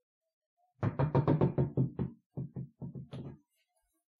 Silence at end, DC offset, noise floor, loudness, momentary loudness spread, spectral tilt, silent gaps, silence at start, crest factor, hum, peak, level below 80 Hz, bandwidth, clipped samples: 0.85 s; under 0.1%; -79 dBFS; -33 LUFS; 17 LU; -11 dB/octave; 2.26-2.30 s; 0.8 s; 20 dB; none; -16 dBFS; -56 dBFS; 4.6 kHz; under 0.1%